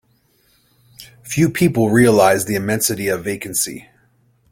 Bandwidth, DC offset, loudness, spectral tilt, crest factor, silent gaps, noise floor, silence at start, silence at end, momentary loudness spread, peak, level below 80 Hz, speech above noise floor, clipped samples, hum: 16.5 kHz; under 0.1%; -16 LUFS; -5 dB/octave; 18 dB; none; -59 dBFS; 1 s; 0.7 s; 12 LU; -2 dBFS; -50 dBFS; 43 dB; under 0.1%; none